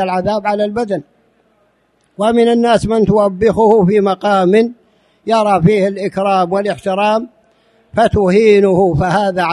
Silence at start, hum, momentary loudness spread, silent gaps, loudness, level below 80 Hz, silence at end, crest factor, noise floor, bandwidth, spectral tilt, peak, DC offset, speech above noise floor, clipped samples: 0 s; none; 8 LU; none; -13 LUFS; -40 dBFS; 0 s; 14 dB; -58 dBFS; 11.5 kHz; -7 dB/octave; 0 dBFS; under 0.1%; 46 dB; under 0.1%